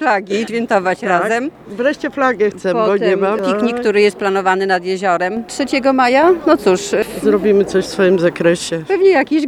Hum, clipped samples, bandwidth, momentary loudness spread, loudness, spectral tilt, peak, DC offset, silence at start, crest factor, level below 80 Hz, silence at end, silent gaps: none; under 0.1%; 13 kHz; 7 LU; -15 LUFS; -5 dB/octave; 0 dBFS; under 0.1%; 0 s; 14 dB; -52 dBFS; 0 s; none